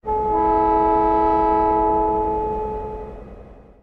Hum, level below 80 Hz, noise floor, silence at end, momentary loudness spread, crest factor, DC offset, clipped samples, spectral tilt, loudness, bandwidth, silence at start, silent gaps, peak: none; -36 dBFS; -42 dBFS; 0.3 s; 14 LU; 12 dB; under 0.1%; under 0.1%; -9.5 dB/octave; -19 LUFS; 5.2 kHz; 0.05 s; none; -8 dBFS